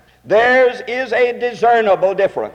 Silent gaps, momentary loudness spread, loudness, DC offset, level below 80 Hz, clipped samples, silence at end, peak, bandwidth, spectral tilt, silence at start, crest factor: none; 6 LU; -15 LUFS; under 0.1%; -54 dBFS; under 0.1%; 0.05 s; -4 dBFS; 9.2 kHz; -4.5 dB/octave; 0.25 s; 12 dB